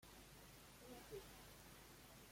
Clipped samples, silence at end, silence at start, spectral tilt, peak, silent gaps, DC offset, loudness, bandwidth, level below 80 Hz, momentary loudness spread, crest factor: under 0.1%; 0 s; 0 s; -3.5 dB/octave; -42 dBFS; none; under 0.1%; -60 LUFS; 16.5 kHz; -70 dBFS; 5 LU; 18 dB